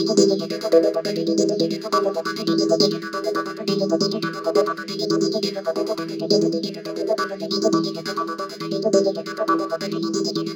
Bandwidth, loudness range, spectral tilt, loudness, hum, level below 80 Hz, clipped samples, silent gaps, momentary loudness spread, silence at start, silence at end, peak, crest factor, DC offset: 17.5 kHz; 2 LU; -4.5 dB/octave; -22 LUFS; none; -72 dBFS; under 0.1%; none; 8 LU; 0 s; 0 s; -4 dBFS; 18 dB; under 0.1%